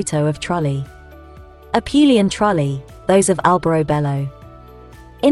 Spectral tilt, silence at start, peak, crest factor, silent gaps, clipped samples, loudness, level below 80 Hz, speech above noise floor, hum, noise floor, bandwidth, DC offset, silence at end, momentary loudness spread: -5.5 dB/octave; 0 s; 0 dBFS; 18 dB; none; under 0.1%; -17 LUFS; -42 dBFS; 24 dB; none; -40 dBFS; 12 kHz; under 0.1%; 0 s; 11 LU